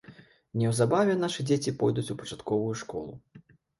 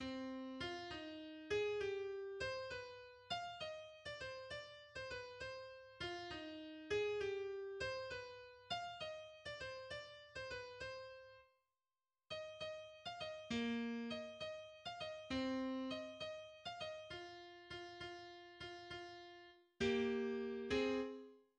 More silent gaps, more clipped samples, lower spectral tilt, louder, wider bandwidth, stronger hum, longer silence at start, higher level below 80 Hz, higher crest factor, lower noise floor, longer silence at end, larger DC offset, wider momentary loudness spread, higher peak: neither; neither; first, -6 dB/octave vs -4.5 dB/octave; first, -29 LUFS vs -46 LUFS; first, 11.5 kHz vs 9.8 kHz; neither; about the same, 0.1 s vs 0 s; first, -62 dBFS vs -70 dBFS; about the same, 18 dB vs 20 dB; second, -53 dBFS vs under -90 dBFS; first, 0.4 s vs 0.15 s; neither; about the same, 13 LU vs 13 LU; first, -10 dBFS vs -28 dBFS